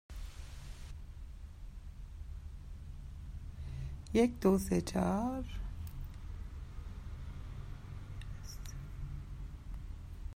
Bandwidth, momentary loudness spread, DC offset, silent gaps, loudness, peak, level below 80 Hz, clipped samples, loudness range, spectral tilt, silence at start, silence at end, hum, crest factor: 16 kHz; 19 LU; under 0.1%; none; -39 LUFS; -18 dBFS; -46 dBFS; under 0.1%; 15 LU; -6.5 dB/octave; 0.1 s; 0 s; none; 22 dB